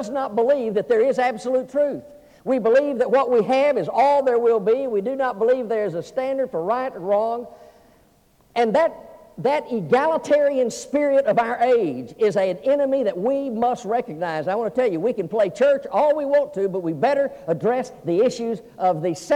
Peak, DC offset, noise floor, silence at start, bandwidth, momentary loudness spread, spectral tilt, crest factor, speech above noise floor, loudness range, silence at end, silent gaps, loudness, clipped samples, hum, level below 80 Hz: -6 dBFS; under 0.1%; -57 dBFS; 0 s; 11 kHz; 7 LU; -6 dB/octave; 14 dB; 37 dB; 5 LU; 0 s; none; -21 LUFS; under 0.1%; none; -64 dBFS